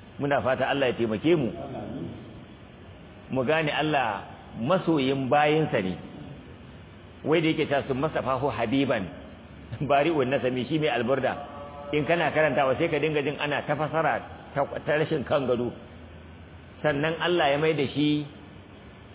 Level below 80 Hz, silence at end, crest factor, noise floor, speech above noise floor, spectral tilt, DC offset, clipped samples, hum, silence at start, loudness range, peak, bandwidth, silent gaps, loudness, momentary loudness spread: -54 dBFS; 0 s; 18 dB; -47 dBFS; 22 dB; -10 dB/octave; under 0.1%; under 0.1%; none; 0 s; 3 LU; -10 dBFS; 4 kHz; none; -26 LUFS; 22 LU